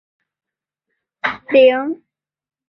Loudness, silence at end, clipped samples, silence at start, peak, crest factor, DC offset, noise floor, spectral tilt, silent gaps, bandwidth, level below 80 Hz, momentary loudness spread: -15 LUFS; 0.75 s; under 0.1%; 1.25 s; -2 dBFS; 18 dB; under 0.1%; -81 dBFS; -5.5 dB/octave; none; 5.6 kHz; -64 dBFS; 15 LU